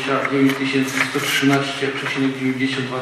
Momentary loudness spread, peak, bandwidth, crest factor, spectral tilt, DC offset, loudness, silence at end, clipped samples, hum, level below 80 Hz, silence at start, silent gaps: 5 LU; -4 dBFS; 15 kHz; 16 dB; -4.5 dB/octave; under 0.1%; -19 LUFS; 0 s; under 0.1%; none; -64 dBFS; 0 s; none